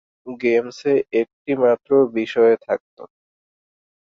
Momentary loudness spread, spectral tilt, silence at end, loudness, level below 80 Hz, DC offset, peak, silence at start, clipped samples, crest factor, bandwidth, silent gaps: 8 LU; -6.5 dB/octave; 1 s; -19 LUFS; -66 dBFS; under 0.1%; -4 dBFS; 0.25 s; under 0.1%; 16 dB; 7.2 kHz; 1.33-1.45 s, 2.80-2.97 s